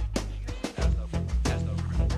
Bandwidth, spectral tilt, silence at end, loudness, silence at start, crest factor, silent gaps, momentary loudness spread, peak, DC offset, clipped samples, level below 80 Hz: 12 kHz; -6 dB/octave; 0 s; -30 LUFS; 0 s; 14 dB; none; 6 LU; -14 dBFS; under 0.1%; under 0.1%; -30 dBFS